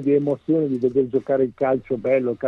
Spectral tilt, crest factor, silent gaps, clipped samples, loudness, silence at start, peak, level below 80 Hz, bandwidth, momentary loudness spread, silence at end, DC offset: -10 dB/octave; 12 dB; none; under 0.1%; -21 LUFS; 0 s; -8 dBFS; -58 dBFS; 4.2 kHz; 2 LU; 0 s; under 0.1%